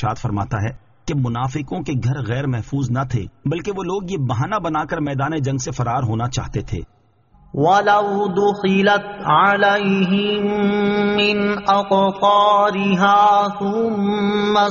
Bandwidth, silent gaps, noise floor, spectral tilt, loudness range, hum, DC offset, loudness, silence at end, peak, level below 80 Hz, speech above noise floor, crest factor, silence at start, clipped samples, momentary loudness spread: 7.2 kHz; none; -52 dBFS; -4.5 dB/octave; 7 LU; none; under 0.1%; -18 LUFS; 0 s; -4 dBFS; -44 dBFS; 34 dB; 14 dB; 0 s; under 0.1%; 10 LU